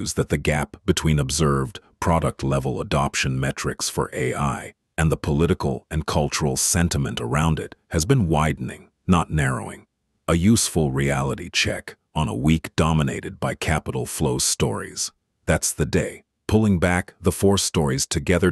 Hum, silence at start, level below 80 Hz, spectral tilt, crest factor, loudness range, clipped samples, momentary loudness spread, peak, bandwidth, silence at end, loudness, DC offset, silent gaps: none; 0 s; -36 dBFS; -4.5 dB/octave; 18 dB; 2 LU; under 0.1%; 9 LU; -4 dBFS; 12.5 kHz; 0 s; -22 LUFS; under 0.1%; none